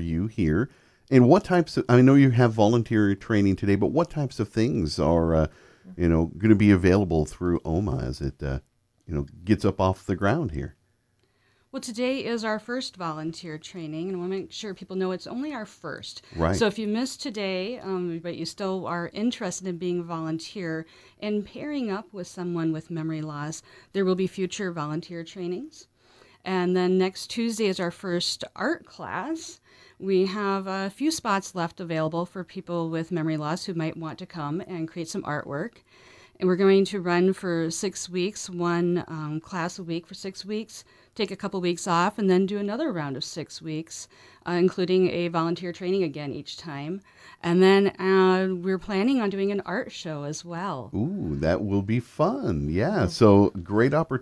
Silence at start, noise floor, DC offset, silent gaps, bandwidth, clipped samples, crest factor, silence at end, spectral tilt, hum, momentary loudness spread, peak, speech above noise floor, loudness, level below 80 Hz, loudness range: 0 s; -68 dBFS; under 0.1%; none; 11 kHz; under 0.1%; 22 dB; 0 s; -6 dB/octave; none; 14 LU; -4 dBFS; 43 dB; -26 LUFS; -46 dBFS; 8 LU